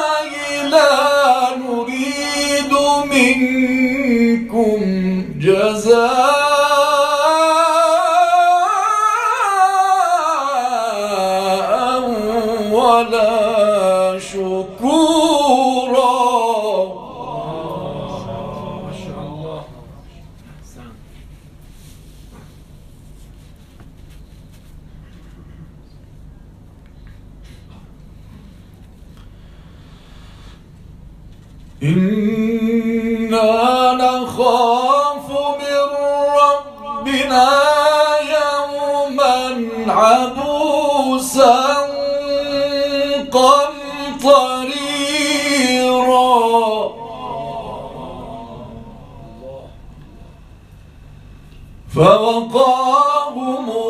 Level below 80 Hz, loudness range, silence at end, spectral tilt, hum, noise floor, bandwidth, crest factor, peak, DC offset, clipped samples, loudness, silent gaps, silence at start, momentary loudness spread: -44 dBFS; 14 LU; 0 s; -4 dB/octave; none; -41 dBFS; 15 kHz; 16 dB; 0 dBFS; under 0.1%; under 0.1%; -15 LUFS; none; 0 s; 15 LU